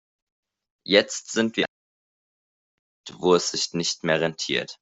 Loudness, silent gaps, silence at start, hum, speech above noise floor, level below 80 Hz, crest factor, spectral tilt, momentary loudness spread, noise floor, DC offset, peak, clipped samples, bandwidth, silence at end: -23 LUFS; 1.68-3.04 s; 0.85 s; none; over 66 dB; -66 dBFS; 24 dB; -3 dB/octave; 7 LU; under -90 dBFS; under 0.1%; -2 dBFS; under 0.1%; 8.2 kHz; 0.1 s